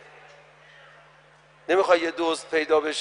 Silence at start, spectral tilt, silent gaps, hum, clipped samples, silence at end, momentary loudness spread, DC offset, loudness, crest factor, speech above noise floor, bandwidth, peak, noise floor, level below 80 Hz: 1.7 s; -2.5 dB/octave; none; none; under 0.1%; 0 s; 7 LU; under 0.1%; -23 LUFS; 20 dB; 32 dB; 10.5 kHz; -6 dBFS; -55 dBFS; -68 dBFS